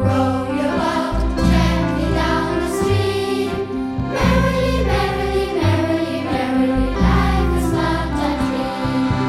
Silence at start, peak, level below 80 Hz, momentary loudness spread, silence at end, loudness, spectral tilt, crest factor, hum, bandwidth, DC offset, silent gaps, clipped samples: 0 s; -4 dBFS; -26 dBFS; 5 LU; 0 s; -19 LUFS; -6.5 dB/octave; 14 dB; none; 14.5 kHz; under 0.1%; none; under 0.1%